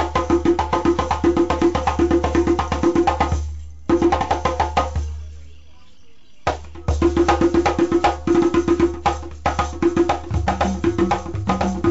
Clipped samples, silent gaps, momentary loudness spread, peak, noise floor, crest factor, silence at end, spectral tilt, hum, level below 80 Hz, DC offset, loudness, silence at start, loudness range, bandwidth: under 0.1%; none; 9 LU; -8 dBFS; -52 dBFS; 12 dB; 0 s; -6.5 dB/octave; none; -30 dBFS; 1%; -19 LUFS; 0 s; 4 LU; 8 kHz